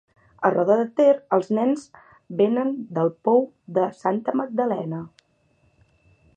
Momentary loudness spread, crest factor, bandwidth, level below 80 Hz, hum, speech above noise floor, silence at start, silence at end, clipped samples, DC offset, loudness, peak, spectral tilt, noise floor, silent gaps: 10 LU; 18 dB; 9 kHz; -70 dBFS; none; 42 dB; 0.4 s; 1.3 s; under 0.1%; under 0.1%; -22 LUFS; -4 dBFS; -8 dB/octave; -64 dBFS; none